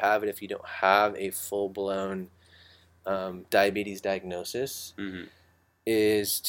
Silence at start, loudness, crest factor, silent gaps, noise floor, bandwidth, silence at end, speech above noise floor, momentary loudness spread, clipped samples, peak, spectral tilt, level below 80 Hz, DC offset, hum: 0 s; -28 LUFS; 24 dB; none; -57 dBFS; 17 kHz; 0 s; 29 dB; 14 LU; under 0.1%; -6 dBFS; -3.5 dB/octave; -66 dBFS; under 0.1%; none